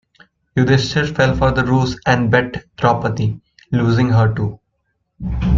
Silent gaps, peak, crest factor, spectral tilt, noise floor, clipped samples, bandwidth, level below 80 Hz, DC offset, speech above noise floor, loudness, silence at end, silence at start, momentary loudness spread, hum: none; 0 dBFS; 16 dB; -7 dB/octave; -69 dBFS; under 0.1%; 7.6 kHz; -32 dBFS; under 0.1%; 54 dB; -17 LUFS; 0 s; 0.55 s; 10 LU; none